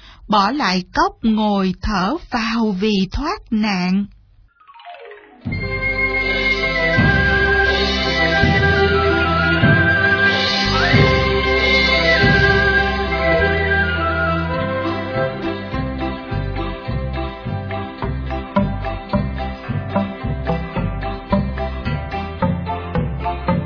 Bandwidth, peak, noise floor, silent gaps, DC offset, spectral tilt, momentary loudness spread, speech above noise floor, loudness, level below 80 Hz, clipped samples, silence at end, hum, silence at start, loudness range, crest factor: 5.4 kHz; 0 dBFS; -50 dBFS; none; under 0.1%; -6 dB/octave; 12 LU; 32 dB; -17 LUFS; -30 dBFS; under 0.1%; 0 s; none; 0 s; 10 LU; 18 dB